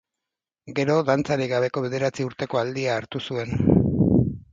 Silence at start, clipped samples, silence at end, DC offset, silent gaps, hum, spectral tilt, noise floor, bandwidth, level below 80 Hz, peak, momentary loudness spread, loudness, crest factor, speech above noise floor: 0.65 s; under 0.1%; 0.1 s; under 0.1%; none; none; -7 dB/octave; -87 dBFS; 7.8 kHz; -42 dBFS; -2 dBFS; 9 LU; -23 LUFS; 20 dB; 64 dB